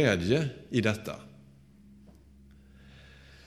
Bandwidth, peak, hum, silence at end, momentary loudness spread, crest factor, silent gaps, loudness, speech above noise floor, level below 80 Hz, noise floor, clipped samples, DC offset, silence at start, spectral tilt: 15.5 kHz; -10 dBFS; none; 2.2 s; 27 LU; 24 dB; none; -29 LUFS; 28 dB; -56 dBFS; -56 dBFS; under 0.1%; under 0.1%; 0 s; -6 dB/octave